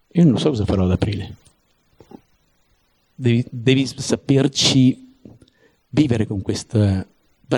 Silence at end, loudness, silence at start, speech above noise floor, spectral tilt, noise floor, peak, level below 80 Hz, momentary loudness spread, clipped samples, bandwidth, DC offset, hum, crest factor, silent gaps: 0 s; -19 LUFS; 0.15 s; 45 dB; -5.5 dB/octave; -62 dBFS; -2 dBFS; -44 dBFS; 10 LU; under 0.1%; 12 kHz; under 0.1%; none; 18 dB; none